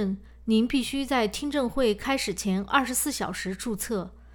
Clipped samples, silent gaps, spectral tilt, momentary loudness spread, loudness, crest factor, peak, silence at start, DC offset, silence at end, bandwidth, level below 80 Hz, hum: under 0.1%; none; -4 dB/octave; 8 LU; -27 LUFS; 20 dB; -6 dBFS; 0 s; under 0.1%; 0 s; over 20 kHz; -48 dBFS; none